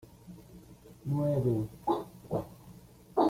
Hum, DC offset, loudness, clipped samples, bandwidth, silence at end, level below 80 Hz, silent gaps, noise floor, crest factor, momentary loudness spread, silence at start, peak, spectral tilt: none; under 0.1%; -33 LUFS; under 0.1%; 16 kHz; 0 s; -60 dBFS; none; -53 dBFS; 20 dB; 24 LU; 0.25 s; -14 dBFS; -9 dB/octave